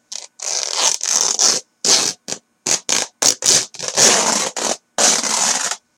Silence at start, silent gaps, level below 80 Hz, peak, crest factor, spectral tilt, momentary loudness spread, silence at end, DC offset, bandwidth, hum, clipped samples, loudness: 0.1 s; none; -66 dBFS; 0 dBFS; 18 dB; 0.5 dB/octave; 10 LU; 0.2 s; under 0.1%; over 20 kHz; none; under 0.1%; -15 LUFS